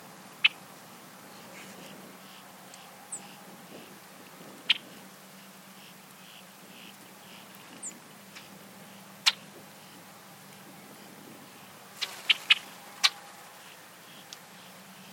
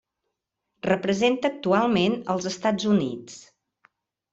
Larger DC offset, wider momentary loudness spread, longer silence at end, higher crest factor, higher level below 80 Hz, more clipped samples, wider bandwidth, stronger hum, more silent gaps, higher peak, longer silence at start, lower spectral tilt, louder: neither; first, 22 LU vs 12 LU; second, 0 s vs 0.95 s; first, 32 dB vs 18 dB; second, -90 dBFS vs -64 dBFS; neither; first, 16.5 kHz vs 8 kHz; neither; neither; about the same, -6 dBFS vs -8 dBFS; second, 0 s vs 0.85 s; second, 0 dB/octave vs -5.5 dB/octave; second, -28 LUFS vs -24 LUFS